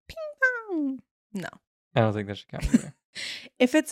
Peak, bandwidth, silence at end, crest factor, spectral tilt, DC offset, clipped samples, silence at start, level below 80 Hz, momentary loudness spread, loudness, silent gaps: -8 dBFS; 15.5 kHz; 0 s; 20 dB; -5.5 dB/octave; under 0.1%; under 0.1%; 0.1 s; -44 dBFS; 15 LU; -28 LUFS; 1.11-1.30 s, 1.67-1.91 s, 3.05-3.13 s